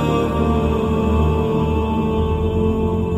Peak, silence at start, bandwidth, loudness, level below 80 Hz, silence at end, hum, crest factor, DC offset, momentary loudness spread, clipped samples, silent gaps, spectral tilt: -6 dBFS; 0 s; 12.5 kHz; -19 LUFS; -26 dBFS; 0 s; none; 12 dB; under 0.1%; 2 LU; under 0.1%; none; -8.5 dB/octave